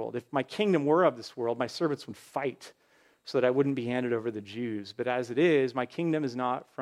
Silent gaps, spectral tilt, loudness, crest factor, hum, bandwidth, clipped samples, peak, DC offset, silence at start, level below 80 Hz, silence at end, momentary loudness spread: none; -6.5 dB/octave; -29 LUFS; 18 dB; none; 13 kHz; under 0.1%; -12 dBFS; under 0.1%; 0 s; -78 dBFS; 0 s; 11 LU